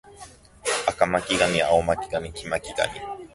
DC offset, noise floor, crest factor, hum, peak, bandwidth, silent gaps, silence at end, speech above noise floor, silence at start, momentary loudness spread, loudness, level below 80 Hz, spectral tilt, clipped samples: under 0.1%; -47 dBFS; 20 dB; none; -4 dBFS; 11.5 kHz; none; 0.05 s; 23 dB; 0.05 s; 10 LU; -24 LUFS; -48 dBFS; -3 dB/octave; under 0.1%